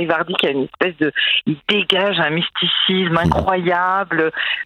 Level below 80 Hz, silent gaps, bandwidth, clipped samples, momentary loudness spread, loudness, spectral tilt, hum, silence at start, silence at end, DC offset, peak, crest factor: -44 dBFS; none; 15 kHz; under 0.1%; 4 LU; -17 LUFS; -6 dB/octave; none; 0 s; 0 s; under 0.1%; 0 dBFS; 18 dB